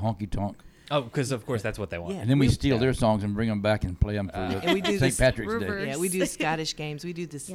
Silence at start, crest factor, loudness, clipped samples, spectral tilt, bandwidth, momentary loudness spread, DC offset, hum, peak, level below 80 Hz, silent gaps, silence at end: 0 s; 18 dB; -27 LUFS; under 0.1%; -5.5 dB/octave; 16 kHz; 10 LU; under 0.1%; none; -8 dBFS; -40 dBFS; none; 0 s